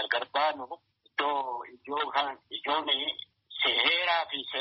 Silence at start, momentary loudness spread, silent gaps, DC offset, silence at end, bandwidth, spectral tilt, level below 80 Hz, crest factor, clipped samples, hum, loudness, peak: 0 s; 16 LU; none; under 0.1%; 0 s; 5.8 kHz; 3 dB/octave; -76 dBFS; 22 dB; under 0.1%; none; -29 LUFS; -10 dBFS